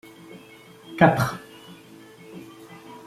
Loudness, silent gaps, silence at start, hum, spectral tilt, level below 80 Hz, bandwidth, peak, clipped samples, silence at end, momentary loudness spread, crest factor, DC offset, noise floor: -21 LUFS; none; 0.3 s; none; -6.5 dB/octave; -58 dBFS; 15.5 kHz; -2 dBFS; under 0.1%; 0.1 s; 27 LU; 24 dB; under 0.1%; -48 dBFS